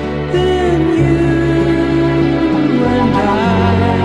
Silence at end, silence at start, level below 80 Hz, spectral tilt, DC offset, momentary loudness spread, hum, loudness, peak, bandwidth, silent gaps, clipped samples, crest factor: 0 s; 0 s; -28 dBFS; -7.5 dB/octave; 0.7%; 1 LU; none; -13 LUFS; 0 dBFS; 10.5 kHz; none; under 0.1%; 12 dB